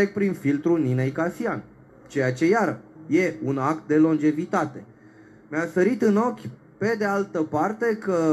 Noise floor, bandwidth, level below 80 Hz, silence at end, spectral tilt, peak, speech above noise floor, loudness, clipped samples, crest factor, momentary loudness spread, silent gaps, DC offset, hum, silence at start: -50 dBFS; 12.5 kHz; -66 dBFS; 0 s; -7.5 dB/octave; -10 dBFS; 27 dB; -24 LUFS; under 0.1%; 14 dB; 10 LU; none; under 0.1%; none; 0 s